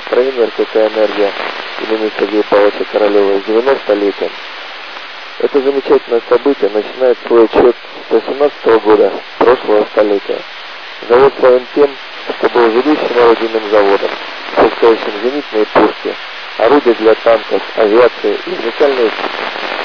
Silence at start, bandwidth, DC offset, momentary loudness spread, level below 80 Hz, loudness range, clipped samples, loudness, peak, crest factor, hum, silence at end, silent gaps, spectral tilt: 0 s; 5.4 kHz; 1%; 12 LU; -50 dBFS; 3 LU; 0.1%; -12 LUFS; 0 dBFS; 12 dB; none; 0 s; none; -5.5 dB/octave